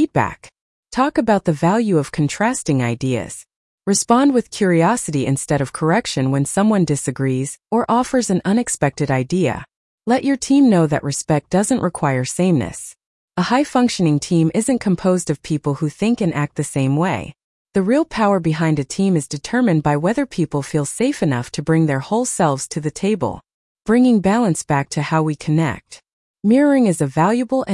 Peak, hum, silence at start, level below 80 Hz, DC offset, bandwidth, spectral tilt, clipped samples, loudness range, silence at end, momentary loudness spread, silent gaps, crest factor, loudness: -2 dBFS; none; 0 s; -50 dBFS; under 0.1%; 12 kHz; -6 dB/octave; under 0.1%; 2 LU; 0 s; 7 LU; 0.61-0.83 s, 3.56-3.78 s, 9.76-9.98 s, 13.06-13.28 s, 17.44-17.65 s, 23.54-23.75 s, 26.13-26.34 s; 16 dB; -18 LUFS